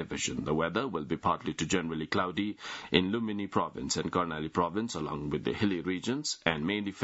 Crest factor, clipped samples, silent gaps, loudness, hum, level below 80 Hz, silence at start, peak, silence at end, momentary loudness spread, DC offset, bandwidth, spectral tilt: 26 dB; under 0.1%; none; -32 LUFS; none; -58 dBFS; 0 s; -6 dBFS; 0 s; 5 LU; under 0.1%; 8.2 kHz; -4.5 dB/octave